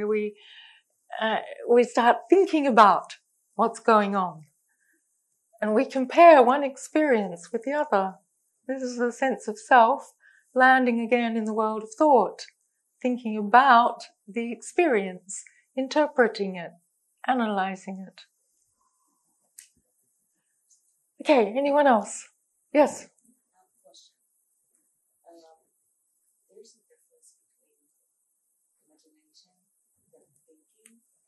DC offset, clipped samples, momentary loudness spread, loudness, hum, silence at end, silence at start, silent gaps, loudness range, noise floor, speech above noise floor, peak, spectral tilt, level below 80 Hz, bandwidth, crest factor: under 0.1%; under 0.1%; 19 LU; -22 LUFS; none; 8.25 s; 0 s; none; 10 LU; -75 dBFS; 53 dB; -2 dBFS; -4.5 dB/octave; -84 dBFS; 12 kHz; 22 dB